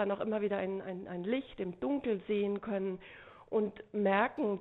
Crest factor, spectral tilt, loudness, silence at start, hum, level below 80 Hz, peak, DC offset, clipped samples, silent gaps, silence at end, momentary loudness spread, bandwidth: 18 dB; -9.5 dB/octave; -35 LUFS; 0 s; none; -68 dBFS; -16 dBFS; under 0.1%; under 0.1%; none; 0 s; 11 LU; 4.1 kHz